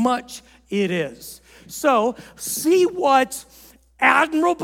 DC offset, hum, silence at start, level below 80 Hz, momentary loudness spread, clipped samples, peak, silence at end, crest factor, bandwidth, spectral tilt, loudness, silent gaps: under 0.1%; none; 0 s; -58 dBFS; 20 LU; under 0.1%; 0 dBFS; 0 s; 20 dB; 17.5 kHz; -4 dB/octave; -20 LUFS; none